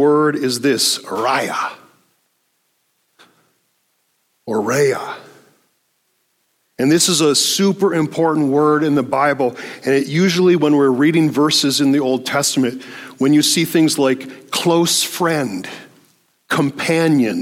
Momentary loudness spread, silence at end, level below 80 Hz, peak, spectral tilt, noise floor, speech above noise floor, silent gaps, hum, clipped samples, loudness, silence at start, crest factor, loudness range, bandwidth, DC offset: 10 LU; 0 s; -66 dBFS; -2 dBFS; -4 dB/octave; -66 dBFS; 50 dB; none; none; under 0.1%; -16 LUFS; 0 s; 14 dB; 9 LU; 16.5 kHz; under 0.1%